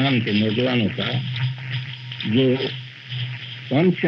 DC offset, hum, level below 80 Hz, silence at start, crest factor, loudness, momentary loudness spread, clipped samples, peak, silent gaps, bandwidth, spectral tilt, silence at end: under 0.1%; none; -66 dBFS; 0 s; 14 dB; -23 LUFS; 11 LU; under 0.1%; -8 dBFS; none; 6.2 kHz; -8 dB/octave; 0 s